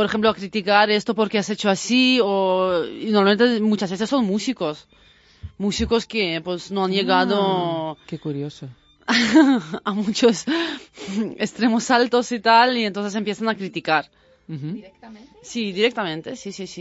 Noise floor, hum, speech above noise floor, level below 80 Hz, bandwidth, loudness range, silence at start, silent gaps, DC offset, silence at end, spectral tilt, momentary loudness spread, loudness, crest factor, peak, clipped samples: -41 dBFS; none; 20 dB; -50 dBFS; 8 kHz; 5 LU; 0 s; none; under 0.1%; 0 s; -4.5 dB/octave; 15 LU; -20 LUFS; 18 dB; -2 dBFS; under 0.1%